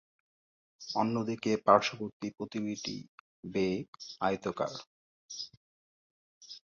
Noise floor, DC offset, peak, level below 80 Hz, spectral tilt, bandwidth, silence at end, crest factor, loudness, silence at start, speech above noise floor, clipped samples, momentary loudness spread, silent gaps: under -90 dBFS; under 0.1%; -8 dBFS; -70 dBFS; -5 dB/octave; 7.4 kHz; 0.15 s; 26 dB; -33 LUFS; 0.8 s; over 58 dB; under 0.1%; 20 LU; 2.13-2.20 s, 3.09-3.43 s, 3.88-3.93 s, 4.87-5.29 s, 5.57-6.41 s